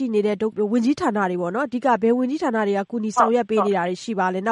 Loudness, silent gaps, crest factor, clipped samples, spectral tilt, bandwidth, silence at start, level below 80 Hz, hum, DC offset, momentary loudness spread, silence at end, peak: -21 LUFS; none; 18 dB; under 0.1%; -6 dB/octave; 11 kHz; 0 s; -66 dBFS; none; under 0.1%; 5 LU; 0 s; -4 dBFS